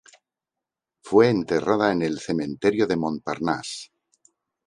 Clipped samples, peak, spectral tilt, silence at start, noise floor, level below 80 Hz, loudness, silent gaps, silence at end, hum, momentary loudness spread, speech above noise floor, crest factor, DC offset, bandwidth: under 0.1%; -4 dBFS; -6 dB/octave; 1.05 s; -87 dBFS; -58 dBFS; -23 LUFS; none; 0.8 s; none; 9 LU; 65 dB; 20 dB; under 0.1%; 11 kHz